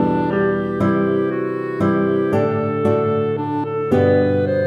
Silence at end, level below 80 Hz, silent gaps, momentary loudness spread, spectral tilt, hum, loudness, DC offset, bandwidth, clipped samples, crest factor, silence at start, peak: 0 s; -50 dBFS; none; 6 LU; -9.5 dB/octave; none; -18 LUFS; under 0.1%; 7.2 kHz; under 0.1%; 14 dB; 0 s; -4 dBFS